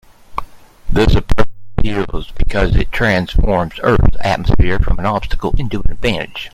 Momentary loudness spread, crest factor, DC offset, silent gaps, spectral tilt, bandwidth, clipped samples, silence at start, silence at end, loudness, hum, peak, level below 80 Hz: 9 LU; 12 dB; under 0.1%; none; -7 dB/octave; 9.2 kHz; under 0.1%; 0.3 s; 0.05 s; -17 LUFS; none; 0 dBFS; -18 dBFS